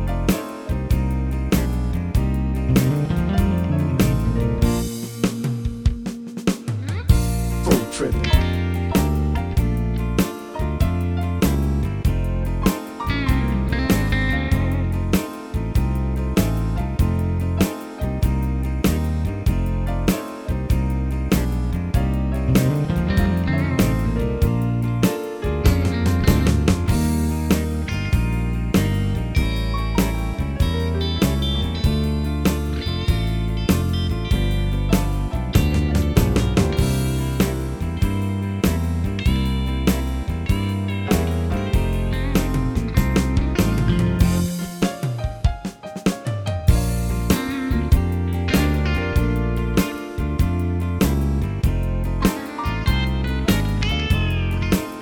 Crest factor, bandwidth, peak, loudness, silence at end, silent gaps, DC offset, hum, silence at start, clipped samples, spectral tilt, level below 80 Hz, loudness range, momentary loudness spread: 18 dB; 20 kHz; -2 dBFS; -21 LUFS; 0 s; none; under 0.1%; none; 0 s; under 0.1%; -6.5 dB/octave; -24 dBFS; 2 LU; 5 LU